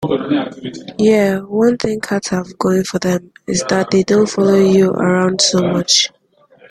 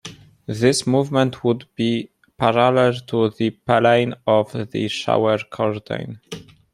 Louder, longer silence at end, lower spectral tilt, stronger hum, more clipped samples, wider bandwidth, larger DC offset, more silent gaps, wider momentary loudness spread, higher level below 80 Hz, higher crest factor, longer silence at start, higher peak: first, -15 LUFS vs -20 LUFS; first, 0.65 s vs 0.3 s; about the same, -4.5 dB/octave vs -5.5 dB/octave; neither; neither; about the same, 13 kHz vs 13.5 kHz; neither; neither; second, 8 LU vs 17 LU; first, -52 dBFS vs -58 dBFS; about the same, 14 dB vs 18 dB; about the same, 0 s vs 0.05 s; about the same, 0 dBFS vs -2 dBFS